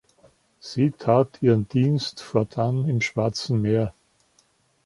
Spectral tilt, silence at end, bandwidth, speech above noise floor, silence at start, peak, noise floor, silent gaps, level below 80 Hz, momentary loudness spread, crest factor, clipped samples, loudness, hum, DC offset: -7 dB/octave; 0.95 s; 11.5 kHz; 42 dB; 0.65 s; -4 dBFS; -64 dBFS; none; -56 dBFS; 6 LU; 20 dB; under 0.1%; -23 LUFS; none; under 0.1%